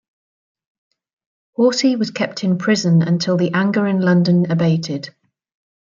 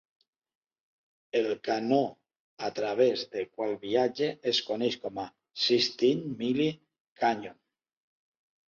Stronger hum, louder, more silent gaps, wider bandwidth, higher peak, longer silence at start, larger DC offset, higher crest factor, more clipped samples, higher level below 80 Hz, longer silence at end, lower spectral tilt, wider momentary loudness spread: neither; first, -17 LUFS vs -29 LUFS; second, none vs 2.40-2.57 s, 7.00-7.16 s; about the same, 7.4 kHz vs 7.4 kHz; first, -4 dBFS vs -12 dBFS; first, 1.6 s vs 1.35 s; neither; about the same, 14 dB vs 18 dB; neither; first, -64 dBFS vs -74 dBFS; second, 0.9 s vs 1.2 s; about the same, -6 dB/octave vs -5 dB/octave; second, 7 LU vs 11 LU